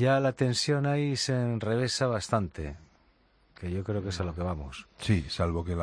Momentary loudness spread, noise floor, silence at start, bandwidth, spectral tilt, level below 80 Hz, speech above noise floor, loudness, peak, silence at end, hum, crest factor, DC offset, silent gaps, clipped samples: 12 LU; -65 dBFS; 0 s; 10.5 kHz; -5.5 dB/octave; -48 dBFS; 36 dB; -29 LUFS; -12 dBFS; 0 s; none; 18 dB; under 0.1%; none; under 0.1%